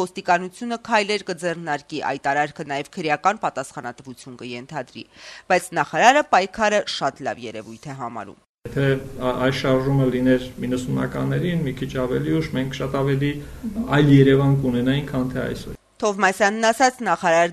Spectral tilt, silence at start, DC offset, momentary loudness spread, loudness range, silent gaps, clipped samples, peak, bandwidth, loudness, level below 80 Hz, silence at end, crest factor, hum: -5.5 dB/octave; 0 s; under 0.1%; 17 LU; 6 LU; 8.49-8.55 s; under 0.1%; -2 dBFS; 13.5 kHz; -21 LUFS; -46 dBFS; 0 s; 20 dB; none